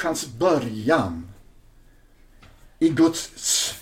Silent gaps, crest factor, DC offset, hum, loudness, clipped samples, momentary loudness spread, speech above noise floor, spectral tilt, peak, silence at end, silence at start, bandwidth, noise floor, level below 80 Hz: none; 18 dB; under 0.1%; none; -22 LUFS; under 0.1%; 7 LU; 30 dB; -3.5 dB/octave; -8 dBFS; 0 s; 0 s; 16.5 kHz; -52 dBFS; -52 dBFS